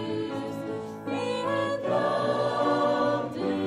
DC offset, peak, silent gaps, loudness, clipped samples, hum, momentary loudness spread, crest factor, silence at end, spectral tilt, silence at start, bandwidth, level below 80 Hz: under 0.1%; -14 dBFS; none; -28 LUFS; under 0.1%; none; 9 LU; 14 dB; 0 s; -6 dB/octave; 0 s; 11.5 kHz; -68 dBFS